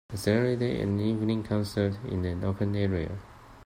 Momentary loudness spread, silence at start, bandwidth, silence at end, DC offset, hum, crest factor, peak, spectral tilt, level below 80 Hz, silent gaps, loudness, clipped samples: 6 LU; 0.1 s; 16 kHz; 0 s; under 0.1%; none; 18 dB; -12 dBFS; -7.5 dB/octave; -52 dBFS; none; -29 LUFS; under 0.1%